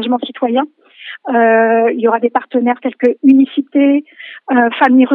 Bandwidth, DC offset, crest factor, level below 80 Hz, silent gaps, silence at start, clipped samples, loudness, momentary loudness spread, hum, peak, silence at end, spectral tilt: 4.1 kHz; under 0.1%; 12 dB; -74 dBFS; none; 0 s; under 0.1%; -13 LUFS; 16 LU; none; 0 dBFS; 0 s; -7.5 dB/octave